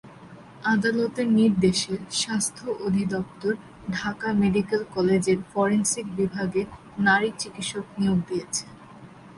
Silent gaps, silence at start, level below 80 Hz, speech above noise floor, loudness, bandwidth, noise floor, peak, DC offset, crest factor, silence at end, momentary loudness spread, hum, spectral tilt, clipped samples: none; 0.05 s; -54 dBFS; 22 dB; -25 LUFS; 11.5 kHz; -46 dBFS; -8 dBFS; under 0.1%; 18 dB; 0 s; 10 LU; none; -4.5 dB/octave; under 0.1%